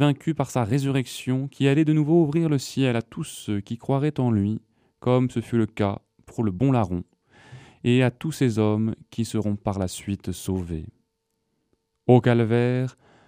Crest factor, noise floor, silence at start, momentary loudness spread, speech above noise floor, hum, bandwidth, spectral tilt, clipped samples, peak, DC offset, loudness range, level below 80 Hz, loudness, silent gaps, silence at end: 20 dB; -76 dBFS; 0 s; 11 LU; 53 dB; none; 15.5 kHz; -7 dB/octave; under 0.1%; -2 dBFS; under 0.1%; 4 LU; -54 dBFS; -24 LUFS; none; 0.35 s